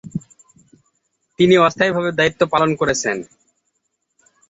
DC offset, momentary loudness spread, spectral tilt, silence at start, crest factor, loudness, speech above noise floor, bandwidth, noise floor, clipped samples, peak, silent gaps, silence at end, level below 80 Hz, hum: under 0.1%; 14 LU; -4.5 dB/octave; 0.05 s; 18 dB; -17 LUFS; 56 dB; 8.2 kHz; -72 dBFS; under 0.1%; -2 dBFS; none; 1.25 s; -54 dBFS; none